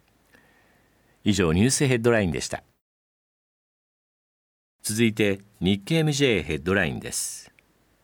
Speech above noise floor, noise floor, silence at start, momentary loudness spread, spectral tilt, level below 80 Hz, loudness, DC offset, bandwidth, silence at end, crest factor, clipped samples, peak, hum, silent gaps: 39 dB; -62 dBFS; 1.25 s; 10 LU; -4.5 dB/octave; -50 dBFS; -24 LUFS; under 0.1%; 18.5 kHz; 0.6 s; 20 dB; under 0.1%; -6 dBFS; none; 2.81-4.79 s